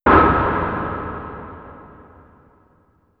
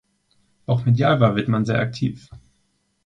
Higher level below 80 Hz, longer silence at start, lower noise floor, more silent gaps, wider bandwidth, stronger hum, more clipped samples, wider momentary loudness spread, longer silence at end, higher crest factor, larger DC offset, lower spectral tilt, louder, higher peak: first, -34 dBFS vs -52 dBFS; second, 0.05 s vs 0.7 s; second, -58 dBFS vs -68 dBFS; neither; second, 5.4 kHz vs 7.6 kHz; neither; neither; first, 26 LU vs 12 LU; first, 1.35 s vs 0.7 s; about the same, 20 dB vs 18 dB; neither; first, -10 dB/octave vs -8 dB/octave; about the same, -19 LUFS vs -20 LUFS; about the same, 0 dBFS vs -2 dBFS